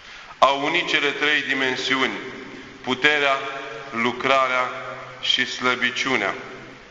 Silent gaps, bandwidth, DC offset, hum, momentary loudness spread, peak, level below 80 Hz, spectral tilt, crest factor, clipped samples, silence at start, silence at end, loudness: none; 8.2 kHz; under 0.1%; none; 15 LU; 0 dBFS; -60 dBFS; -2.5 dB/octave; 22 dB; under 0.1%; 0 s; 0 s; -21 LUFS